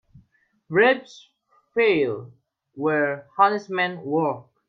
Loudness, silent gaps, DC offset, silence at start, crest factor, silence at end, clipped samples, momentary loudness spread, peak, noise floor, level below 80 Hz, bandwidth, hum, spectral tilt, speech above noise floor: -22 LUFS; none; under 0.1%; 0.7 s; 20 dB; 0.3 s; under 0.1%; 8 LU; -4 dBFS; -64 dBFS; -68 dBFS; 7 kHz; none; -6.5 dB/octave; 42 dB